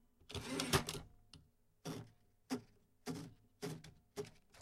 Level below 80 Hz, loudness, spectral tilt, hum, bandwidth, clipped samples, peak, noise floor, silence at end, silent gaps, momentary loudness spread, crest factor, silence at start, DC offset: -62 dBFS; -45 LUFS; -4 dB/octave; none; 16 kHz; under 0.1%; -18 dBFS; -68 dBFS; 0 s; none; 24 LU; 28 dB; 0.3 s; under 0.1%